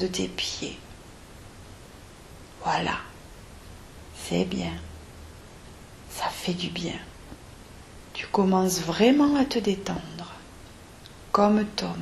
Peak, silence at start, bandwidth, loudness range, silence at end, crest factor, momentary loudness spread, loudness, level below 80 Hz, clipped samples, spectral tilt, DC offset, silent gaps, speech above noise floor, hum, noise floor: -6 dBFS; 0 s; 13.5 kHz; 10 LU; 0 s; 22 dB; 25 LU; -26 LUFS; -50 dBFS; under 0.1%; -5 dB/octave; under 0.1%; none; 22 dB; none; -47 dBFS